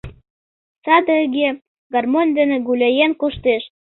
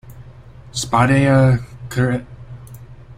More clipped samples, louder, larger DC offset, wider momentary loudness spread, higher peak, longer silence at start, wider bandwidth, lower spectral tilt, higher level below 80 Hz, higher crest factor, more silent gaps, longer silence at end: neither; about the same, -17 LUFS vs -17 LUFS; neither; second, 7 LU vs 24 LU; about the same, -2 dBFS vs -2 dBFS; about the same, 0.05 s vs 0.1 s; second, 4.2 kHz vs 13.5 kHz; first, -8 dB/octave vs -6.5 dB/octave; second, -48 dBFS vs -42 dBFS; about the same, 16 dB vs 16 dB; first, 0.30-0.82 s, 1.67-1.90 s vs none; first, 0.2 s vs 0.05 s